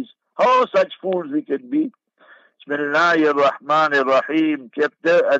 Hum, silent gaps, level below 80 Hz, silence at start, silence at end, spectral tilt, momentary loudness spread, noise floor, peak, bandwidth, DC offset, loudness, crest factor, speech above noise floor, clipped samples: none; none; -74 dBFS; 0 s; 0 s; -5 dB/octave; 9 LU; -51 dBFS; -6 dBFS; 7.8 kHz; under 0.1%; -19 LUFS; 14 dB; 33 dB; under 0.1%